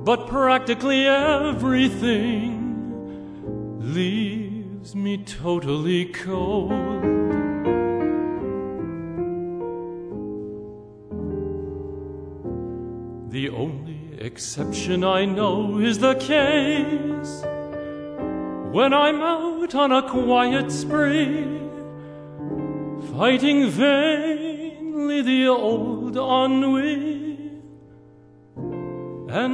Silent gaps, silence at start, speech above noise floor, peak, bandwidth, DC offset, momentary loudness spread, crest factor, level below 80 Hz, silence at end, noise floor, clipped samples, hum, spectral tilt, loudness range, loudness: none; 0 s; 29 dB; -6 dBFS; 10.5 kHz; under 0.1%; 15 LU; 18 dB; -48 dBFS; 0 s; -49 dBFS; under 0.1%; none; -5.5 dB/octave; 10 LU; -23 LUFS